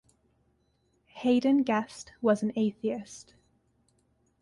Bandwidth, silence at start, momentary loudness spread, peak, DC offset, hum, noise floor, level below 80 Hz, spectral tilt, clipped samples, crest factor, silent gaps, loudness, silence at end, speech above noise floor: 11.5 kHz; 1.15 s; 17 LU; -12 dBFS; under 0.1%; none; -71 dBFS; -70 dBFS; -6 dB/octave; under 0.1%; 18 dB; none; -28 LUFS; 1.2 s; 44 dB